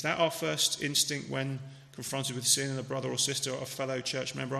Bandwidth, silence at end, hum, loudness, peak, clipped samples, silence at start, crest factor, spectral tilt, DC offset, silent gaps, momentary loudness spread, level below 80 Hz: 13 kHz; 0 s; none; -30 LUFS; -10 dBFS; under 0.1%; 0 s; 22 dB; -2.5 dB/octave; under 0.1%; none; 10 LU; -72 dBFS